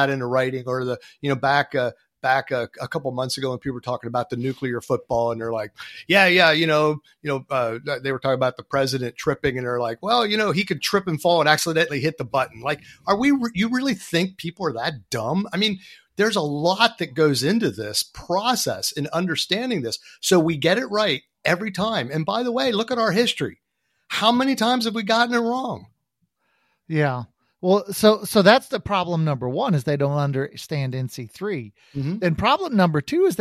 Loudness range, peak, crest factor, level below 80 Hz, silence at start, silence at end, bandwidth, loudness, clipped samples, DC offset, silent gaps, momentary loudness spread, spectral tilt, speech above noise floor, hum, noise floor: 4 LU; 0 dBFS; 22 dB; -56 dBFS; 0 s; 0 s; 16 kHz; -22 LUFS; under 0.1%; under 0.1%; none; 10 LU; -4.5 dB/octave; 51 dB; none; -73 dBFS